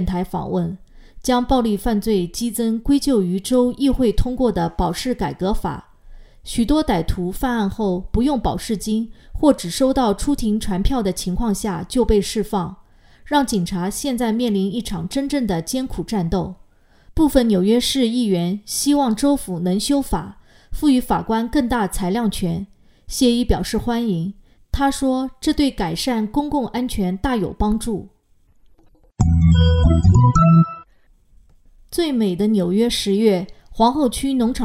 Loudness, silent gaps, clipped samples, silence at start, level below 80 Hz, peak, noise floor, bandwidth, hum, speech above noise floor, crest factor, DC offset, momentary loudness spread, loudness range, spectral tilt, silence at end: -19 LUFS; none; under 0.1%; 0 s; -30 dBFS; 0 dBFS; -55 dBFS; 16 kHz; none; 36 dB; 18 dB; under 0.1%; 8 LU; 5 LU; -6 dB/octave; 0 s